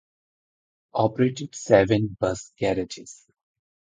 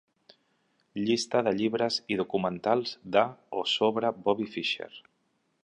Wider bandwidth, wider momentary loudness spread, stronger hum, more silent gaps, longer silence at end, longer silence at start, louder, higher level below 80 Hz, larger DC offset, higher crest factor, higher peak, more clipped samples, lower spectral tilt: second, 9.4 kHz vs 11 kHz; first, 16 LU vs 6 LU; neither; neither; about the same, 0.7 s vs 0.65 s; about the same, 0.95 s vs 0.95 s; first, -24 LUFS vs -28 LUFS; first, -52 dBFS vs -70 dBFS; neither; about the same, 22 dB vs 22 dB; first, -2 dBFS vs -8 dBFS; neither; first, -6 dB/octave vs -4.5 dB/octave